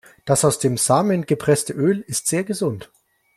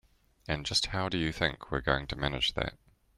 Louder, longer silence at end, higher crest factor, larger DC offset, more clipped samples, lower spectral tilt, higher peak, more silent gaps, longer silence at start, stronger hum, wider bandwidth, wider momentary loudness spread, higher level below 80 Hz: first, -20 LUFS vs -31 LUFS; about the same, 0.5 s vs 0.4 s; about the same, 18 dB vs 22 dB; neither; neither; about the same, -5 dB/octave vs -4 dB/octave; first, -2 dBFS vs -10 dBFS; neither; second, 0.25 s vs 0.5 s; neither; first, 15.5 kHz vs 13 kHz; about the same, 7 LU vs 8 LU; second, -56 dBFS vs -46 dBFS